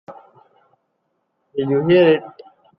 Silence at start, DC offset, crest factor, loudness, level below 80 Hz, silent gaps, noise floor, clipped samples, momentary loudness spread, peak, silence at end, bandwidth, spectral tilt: 0.1 s; under 0.1%; 18 dB; -16 LUFS; -62 dBFS; none; -71 dBFS; under 0.1%; 13 LU; -4 dBFS; 0.5 s; 5.4 kHz; -10 dB/octave